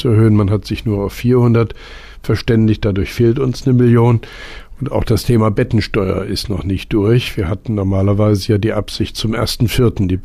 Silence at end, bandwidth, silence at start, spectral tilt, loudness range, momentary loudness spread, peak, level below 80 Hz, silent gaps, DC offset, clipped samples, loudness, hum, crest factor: 0 s; 15 kHz; 0 s; -7 dB/octave; 2 LU; 9 LU; -4 dBFS; -30 dBFS; none; under 0.1%; under 0.1%; -15 LUFS; none; 10 dB